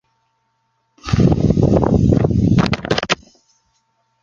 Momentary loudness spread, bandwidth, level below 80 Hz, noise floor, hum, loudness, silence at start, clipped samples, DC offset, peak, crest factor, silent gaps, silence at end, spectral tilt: 7 LU; 7.6 kHz; -30 dBFS; -67 dBFS; none; -16 LUFS; 1.05 s; under 0.1%; under 0.1%; 0 dBFS; 16 dB; none; 1.1 s; -7 dB/octave